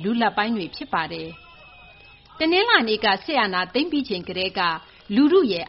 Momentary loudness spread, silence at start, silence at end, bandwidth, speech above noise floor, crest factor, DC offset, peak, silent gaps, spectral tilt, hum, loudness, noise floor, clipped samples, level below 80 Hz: 11 LU; 0 s; 0 s; 5.8 kHz; 27 dB; 20 dB; under 0.1%; -4 dBFS; none; -1.5 dB/octave; none; -21 LUFS; -48 dBFS; under 0.1%; -58 dBFS